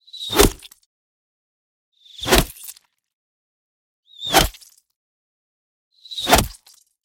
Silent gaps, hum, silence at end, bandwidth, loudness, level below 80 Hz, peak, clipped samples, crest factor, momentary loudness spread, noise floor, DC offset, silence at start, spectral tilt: 0.86-1.92 s, 3.13-4.03 s, 4.96-5.91 s; none; 0.5 s; 17 kHz; -18 LUFS; -32 dBFS; 0 dBFS; under 0.1%; 24 dB; 17 LU; -51 dBFS; under 0.1%; 0.15 s; -3 dB/octave